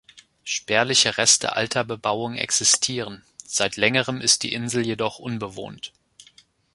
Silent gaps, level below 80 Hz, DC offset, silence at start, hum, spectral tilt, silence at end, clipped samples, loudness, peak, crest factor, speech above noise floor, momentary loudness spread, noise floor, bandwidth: none; -60 dBFS; under 0.1%; 0.15 s; none; -1.5 dB/octave; 0.85 s; under 0.1%; -21 LUFS; -2 dBFS; 22 dB; 33 dB; 18 LU; -56 dBFS; 11.5 kHz